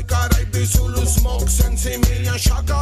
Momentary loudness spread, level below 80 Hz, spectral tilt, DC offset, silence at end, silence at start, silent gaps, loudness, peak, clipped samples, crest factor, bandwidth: 1 LU; -18 dBFS; -4.5 dB/octave; under 0.1%; 0 s; 0 s; none; -18 LUFS; -2 dBFS; under 0.1%; 14 dB; 16 kHz